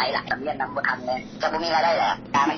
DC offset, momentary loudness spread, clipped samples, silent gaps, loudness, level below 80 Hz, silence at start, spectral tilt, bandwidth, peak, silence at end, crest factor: under 0.1%; 7 LU; under 0.1%; none; -24 LUFS; -56 dBFS; 0 s; -1.5 dB/octave; 6.6 kHz; -8 dBFS; 0 s; 16 dB